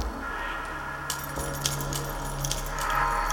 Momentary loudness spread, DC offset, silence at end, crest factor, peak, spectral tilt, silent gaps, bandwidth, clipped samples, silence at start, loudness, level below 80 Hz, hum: 7 LU; under 0.1%; 0 s; 20 dB; -10 dBFS; -3 dB/octave; none; 19.5 kHz; under 0.1%; 0 s; -30 LUFS; -38 dBFS; none